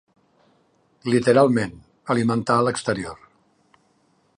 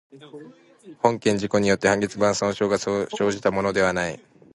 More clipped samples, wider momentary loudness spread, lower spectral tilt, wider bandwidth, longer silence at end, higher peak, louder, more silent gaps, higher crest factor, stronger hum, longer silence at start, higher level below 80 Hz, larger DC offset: neither; first, 16 LU vs 8 LU; first, -6 dB/octave vs -4.5 dB/octave; about the same, 11 kHz vs 11.5 kHz; first, 1.25 s vs 0.4 s; about the same, -4 dBFS vs -2 dBFS; about the same, -21 LUFS vs -22 LUFS; neither; about the same, 20 dB vs 22 dB; neither; first, 1.05 s vs 0.15 s; about the same, -58 dBFS vs -54 dBFS; neither